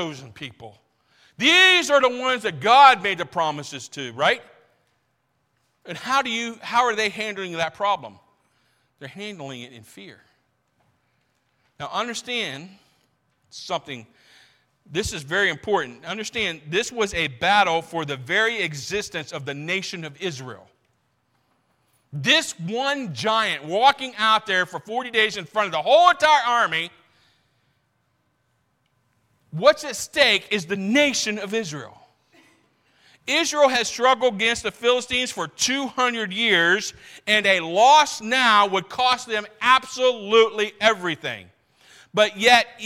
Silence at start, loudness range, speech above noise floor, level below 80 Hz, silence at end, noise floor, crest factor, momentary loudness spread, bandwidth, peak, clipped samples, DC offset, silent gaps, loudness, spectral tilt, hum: 0 s; 13 LU; 49 dB; -60 dBFS; 0 s; -71 dBFS; 22 dB; 17 LU; 16.5 kHz; -2 dBFS; under 0.1%; under 0.1%; none; -20 LUFS; -2.5 dB/octave; none